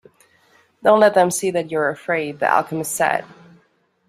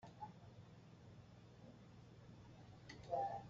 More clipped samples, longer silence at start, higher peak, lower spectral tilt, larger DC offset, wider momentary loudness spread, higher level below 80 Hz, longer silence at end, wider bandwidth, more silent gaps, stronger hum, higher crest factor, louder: neither; first, 0.85 s vs 0 s; first, -2 dBFS vs -30 dBFS; second, -4 dB/octave vs -5.5 dB/octave; neither; second, 9 LU vs 16 LU; first, -66 dBFS vs -74 dBFS; first, 0.85 s vs 0 s; first, 16 kHz vs 7.4 kHz; neither; neither; about the same, 18 dB vs 22 dB; first, -18 LUFS vs -55 LUFS